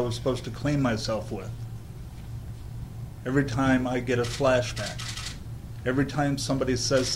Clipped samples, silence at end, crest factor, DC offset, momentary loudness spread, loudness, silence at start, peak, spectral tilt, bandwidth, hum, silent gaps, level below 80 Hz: under 0.1%; 0 s; 18 dB; under 0.1%; 16 LU; -27 LUFS; 0 s; -10 dBFS; -5 dB/octave; 16 kHz; none; none; -44 dBFS